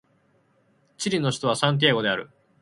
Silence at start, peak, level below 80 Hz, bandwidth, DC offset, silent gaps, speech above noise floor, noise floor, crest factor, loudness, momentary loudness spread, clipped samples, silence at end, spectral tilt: 1 s; -4 dBFS; -66 dBFS; 11.5 kHz; under 0.1%; none; 41 dB; -64 dBFS; 22 dB; -23 LUFS; 9 LU; under 0.1%; 0.35 s; -4.5 dB/octave